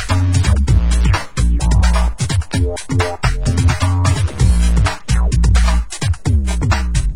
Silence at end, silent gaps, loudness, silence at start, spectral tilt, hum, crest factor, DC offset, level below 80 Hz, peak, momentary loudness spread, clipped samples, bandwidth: 0 s; none; -16 LUFS; 0 s; -5.5 dB/octave; none; 12 dB; 3%; -16 dBFS; 0 dBFS; 5 LU; under 0.1%; 11.5 kHz